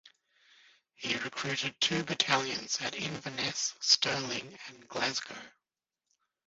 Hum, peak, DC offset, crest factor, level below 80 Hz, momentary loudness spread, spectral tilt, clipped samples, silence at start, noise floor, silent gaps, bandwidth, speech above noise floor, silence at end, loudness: none; -12 dBFS; under 0.1%; 24 dB; -72 dBFS; 15 LU; -1 dB/octave; under 0.1%; 0.05 s; -90 dBFS; none; 7.6 kHz; 56 dB; 1 s; -31 LUFS